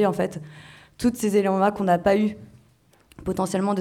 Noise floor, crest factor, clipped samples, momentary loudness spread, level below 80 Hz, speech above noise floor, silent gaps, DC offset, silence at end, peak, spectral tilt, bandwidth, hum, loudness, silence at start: -59 dBFS; 18 dB; under 0.1%; 16 LU; -52 dBFS; 36 dB; none; under 0.1%; 0 s; -6 dBFS; -6.5 dB/octave; 16 kHz; none; -23 LUFS; 0 s